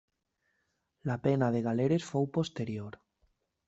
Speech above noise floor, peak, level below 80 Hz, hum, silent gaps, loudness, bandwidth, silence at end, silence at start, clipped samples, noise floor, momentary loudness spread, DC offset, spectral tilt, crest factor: 49 dB; -14 dBFS; -68 dBFS; none; none; -32 LUFS; 8.2 kHz; 0.75 s; 1.05 s; under 0.1%; -80 dBFS; 12 LU; under 0.1%; -7.5 dB/octave; 18 dB